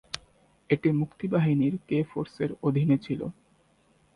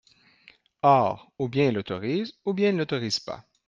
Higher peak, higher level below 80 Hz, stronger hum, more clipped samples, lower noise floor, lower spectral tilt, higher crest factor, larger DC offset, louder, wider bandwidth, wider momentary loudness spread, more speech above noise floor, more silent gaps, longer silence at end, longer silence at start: about the same, -6 dBFS vs -6 dBFS; about the same, -62 dBFS vs -64 dBFS; neither; neither; first, -64 dBFS vs -58 dBFS; first, -8 dB/octave vs -6 dB/octave; about the same, 22 dB vs 20 dB; neither; about the same, -27 LUFS vs -25 LUFS; first, 10.5 kHz vs 9.4 kHz; about the same, 9 LU vs 9 LU; first, 38 dB vs 33 dB; neither; first, 0.85 s vs 0.25 s; second, 0.15 s vs 0.85 s